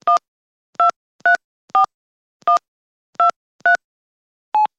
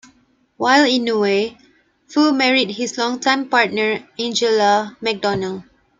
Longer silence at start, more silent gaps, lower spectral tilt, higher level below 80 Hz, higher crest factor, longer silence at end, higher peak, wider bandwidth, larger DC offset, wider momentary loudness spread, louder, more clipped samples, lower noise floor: second, 0.05 s vs 0.6 s; first, 0.28-0.73 s, 0.96-1.19 s, 1.44-1.68 s, 1.94-2.40 s, 2.68-3.13 s, 3.36-3.59 s, 3.84-4.52 s vs none; second, -1 dB/octave vs -3.5 dB/octave; second, -74 dBFS vs -62 dBFS; about the same, 14 dB vs 18 dB; second, 0.15 s vs 0.35 s; second, -6 dBFS vs -2 dBFS; about the same, 8.8 kHz vs 9.4 kHz; neither; second, 5 LU vs 9 LU; about the same, -18 LUFS vs -17 LUFS; neither; first, under -90 dBFS vs -57 dBFS